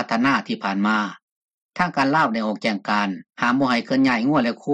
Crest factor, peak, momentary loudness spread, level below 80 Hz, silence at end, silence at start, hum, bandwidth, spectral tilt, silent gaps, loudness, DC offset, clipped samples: 14 dB; -6 dBFS; 6 LU; -62 dBFS; 0 s; 0 s; none; 8.8 kHz; -5.5 dB/octave; 1.22-1.69 s; -21 LUFS; under 0.1%; under 0.1%